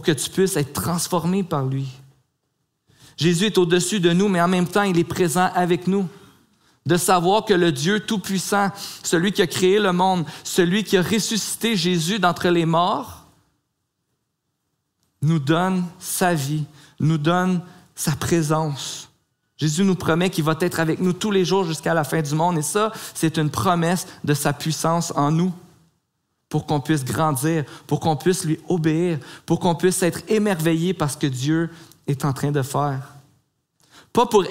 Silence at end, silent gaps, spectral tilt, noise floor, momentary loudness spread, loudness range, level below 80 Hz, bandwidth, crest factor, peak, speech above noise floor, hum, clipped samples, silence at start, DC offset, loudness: 0 s; none; -5 dB/octave; -75 dBFS; 8 LU; 4 LU; -58 dBFS; 16 kHz; 18 dB; -4 dBFS; 55 dB; none; under 0.1%; 0 s; 0.1%; -21 LUFS